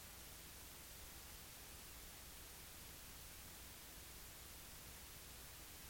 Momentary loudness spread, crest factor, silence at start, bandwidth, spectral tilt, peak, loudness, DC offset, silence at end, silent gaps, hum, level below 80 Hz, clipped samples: 0 LU; 14 dB; 0 s; 17 kHz; -2 dB/octave; -44 dBFS; -55 LUFS; under 0.1%; 0 s; none; none; -64 dBFS; under 0.1%